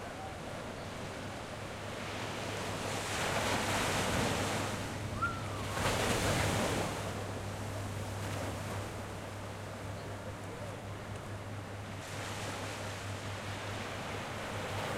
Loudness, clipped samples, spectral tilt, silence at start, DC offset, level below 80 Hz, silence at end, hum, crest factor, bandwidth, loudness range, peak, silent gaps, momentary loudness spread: -37 LUFS; under 0.1%; -4 dB/octave; 0 s; under 0.1%; -54 dBFS; 0 s; none; 20 dB; 16.5 kHz; 9 LU; -18 dBFS; none; 11 LU